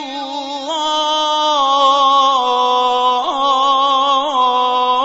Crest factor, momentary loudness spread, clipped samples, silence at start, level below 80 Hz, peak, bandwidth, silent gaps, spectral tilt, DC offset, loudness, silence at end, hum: 12 dB; 9 LU; under 0.1%; 0 s; -60 dBFS; -2 dBFS; 8 kHz; none; 0 dB/octave; under 0.1%; -14 LUFS; 0 s; none